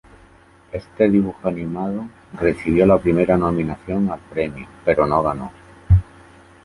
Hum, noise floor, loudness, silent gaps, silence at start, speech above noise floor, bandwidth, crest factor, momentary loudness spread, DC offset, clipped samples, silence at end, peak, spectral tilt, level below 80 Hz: none; -49 dBFS; -19 LUFS; none; 0.75 s; 31 dB; 11.5 kHz; 18 dB; 14 LU; under 0.1%; under 0.1%; 0.6 s; -2 dBFS; -9.5 dB/octave; -34 dBFS